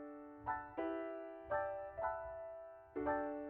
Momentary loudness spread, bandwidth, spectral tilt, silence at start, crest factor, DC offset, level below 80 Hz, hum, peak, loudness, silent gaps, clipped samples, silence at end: 10 LU; 4.1 kHz; -5.5 dB/octave; 0 s; 18 dB; under 0.1%; -66 dBFS; none; -26 dBFS; -44 LUFS; none; under 0.1%; 0 s